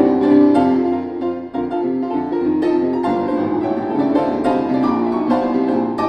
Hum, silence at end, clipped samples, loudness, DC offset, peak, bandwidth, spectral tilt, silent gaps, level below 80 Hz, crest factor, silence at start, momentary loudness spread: none; 0 s; under 0.1%; -17 LUFS; under 0.1%; -2 dBFS; 8.8 kHz; -8 dB/octave; none; -52 dBFS; 16 dB; 0 s; 8 LU